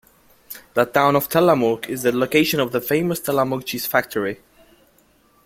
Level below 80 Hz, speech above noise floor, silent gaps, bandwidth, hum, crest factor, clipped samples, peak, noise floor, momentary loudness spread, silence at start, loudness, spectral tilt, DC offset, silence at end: -58 dBFS; 38 dB; none; 16.5 kHz; none; 20 dB; under 0.1%; -2 dBFS; -57 dBFS; 9 LU; 0.5 s; -20 LUFS; -5 dB/octave; under 0.1%; 1.1 s